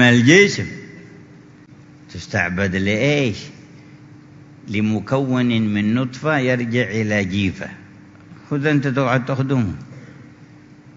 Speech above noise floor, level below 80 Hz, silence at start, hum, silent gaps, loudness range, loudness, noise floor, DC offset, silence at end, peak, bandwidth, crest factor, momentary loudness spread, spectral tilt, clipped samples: 26 dB; -54 dBFS; 0 s; none; none; 3 LU; -18 LUFS; -44 dBFS; under 0.1%; 0.05 s; 0 dBFS; 7.8 kHz; 20 dB; 18 LU; -5.5 dB/octave; under 0.1%